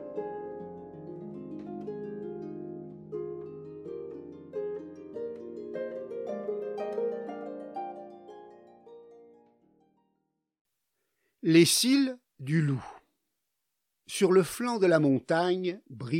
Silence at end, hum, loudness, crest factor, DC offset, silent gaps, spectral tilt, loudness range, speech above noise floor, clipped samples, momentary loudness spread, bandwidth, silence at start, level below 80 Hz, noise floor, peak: 0 s; none; -30 LUFS; 22 dB; under 0.1%; 10.61-10.65 s; -5 dB/octave; 13 LU; 59 dB; under 0.1%; 19 LU; 16.5 kHz; 0 s; -74 dBFS; -83 dBFS; -10 dBFS